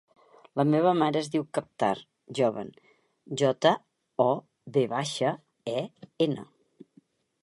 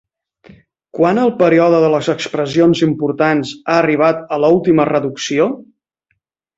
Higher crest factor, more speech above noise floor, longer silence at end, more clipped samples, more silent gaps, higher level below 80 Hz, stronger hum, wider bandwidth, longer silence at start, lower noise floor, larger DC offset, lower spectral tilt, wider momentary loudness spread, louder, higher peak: first, 22 dB vs 14 dB; second, 36 dB vs 55 dB; about the same, 1 s vs 0.95 s; neither; neither; second, -74 dBFS vs -54 dBFS; neither; first, 11.5 kHz vs 8 kHz; second, 0.55 s vs 0.95 s; second, -63 dBFS vs -68 dBFS; neither; about the same, -5.5 dB/octave vs -6 dB/octave; first, 14 LU vs 7 LU; second, -28 LUFS vs -14 LUFS; second, -6 dBFS vs -2 dBFS